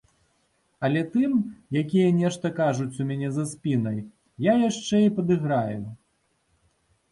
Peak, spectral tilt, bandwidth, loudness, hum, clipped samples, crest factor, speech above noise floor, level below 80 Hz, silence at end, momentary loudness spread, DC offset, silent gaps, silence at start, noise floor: -8 dBFS; -7 dB/octave; 11.5 kHz; -25 LUFS; none; under 0.1%; 16 dB; 46 dB; -62 dBFS; 1.15 s; 9 LU; under 0.1%; none; 0.8 s; -70 dBFS